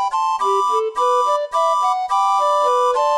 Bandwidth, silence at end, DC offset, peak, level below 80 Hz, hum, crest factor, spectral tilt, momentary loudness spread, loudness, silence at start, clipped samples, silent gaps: 13.5 kHz; 0 s; 0.1%; -6 dBFS; -64 dBFS; none; 10 dB; 0 dB/octave; 2 LU; -17 LUFS; 0 s; under 0.1%; none